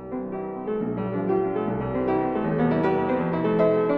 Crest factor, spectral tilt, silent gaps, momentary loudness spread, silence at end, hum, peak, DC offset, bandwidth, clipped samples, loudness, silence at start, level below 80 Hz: 14 dB; -10.5 dB/octave; none; 9 LU; 0 s; none; -10 dBFS; under 0.1%; 5.4 kHz; under 0.1%; -25 LUFS; 0 s; -50 dBFS